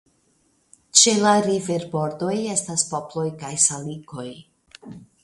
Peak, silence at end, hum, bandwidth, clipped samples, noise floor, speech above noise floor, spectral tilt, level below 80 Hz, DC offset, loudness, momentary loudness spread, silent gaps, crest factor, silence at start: 0 dBFS; 0.2 s; none; 11.5 kHz; under 0.1%; -64 dBFS; 43 dB; -2.5 dB/octave; -64 dBFS; under 0.1%; -20 LUFS; 20 LU; none; 24 dB; 0.95 s